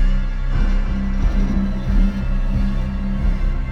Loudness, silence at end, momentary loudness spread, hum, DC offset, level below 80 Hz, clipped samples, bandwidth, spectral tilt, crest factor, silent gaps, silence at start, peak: -22 LUFS; 0 s; 4 LU; none; under 0.1%; -18 dBFS; under 0.1%; 6 kHz; -8 dB/octave; 12 dB; none; 0 s; -6 dBFS